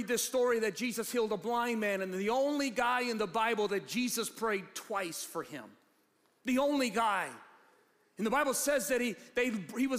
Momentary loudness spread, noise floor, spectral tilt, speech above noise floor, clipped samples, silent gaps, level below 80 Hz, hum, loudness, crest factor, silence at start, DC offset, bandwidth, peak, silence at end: 8 LU; -72 dBFS; -3 dB/octave; 39 dB; under 0.1%; none; -70 dBFS; none; -33 LUFS; 14 dB; 0 s; under 0.1%; 15.5 kHz; -20 dBFS; 0 s